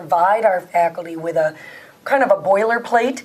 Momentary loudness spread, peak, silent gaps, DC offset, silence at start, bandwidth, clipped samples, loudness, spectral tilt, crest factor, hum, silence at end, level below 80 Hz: 13 LU; -2 dBFS; none; under 0.1%; 0 s; 15.5 kHz; under 0.1%; -18 LUFS; -5 dB/octave; 16 dB; none; 0 s; -70 dBFS